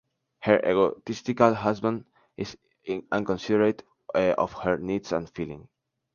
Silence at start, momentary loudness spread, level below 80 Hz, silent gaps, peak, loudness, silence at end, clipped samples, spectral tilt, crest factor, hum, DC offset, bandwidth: 0.4 s; 15 LU; -58 dBFS; none; -4 dBFS; -26 LUFS; 0.5 s; under 0.1%; -6.5 dB/octave; 24 dB; none; under 0.1%; 7.2 kHz